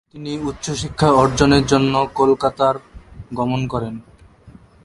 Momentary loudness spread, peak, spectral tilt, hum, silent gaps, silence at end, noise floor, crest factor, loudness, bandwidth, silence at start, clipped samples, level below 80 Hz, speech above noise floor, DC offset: 15 LU; 0 dBFS; -5.5 dB/octave; none; none; 0.35 s; -45 dBFS; 18 dB; -18 LUFS; 11.5 kHz; 0.15 s; under 0.1%; -38 dBFS; 28 dB; under 0.1%